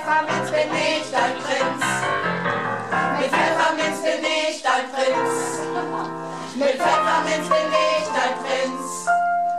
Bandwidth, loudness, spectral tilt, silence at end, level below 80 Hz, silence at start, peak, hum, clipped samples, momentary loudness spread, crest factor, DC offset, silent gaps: 14 kHz; -21 LUFS; -3 dB/octave; 0 s; -70 dBFS; 0 s; -6 dBFS; none; under 0.1%; 7 LU; 16 dB; 0.3%; none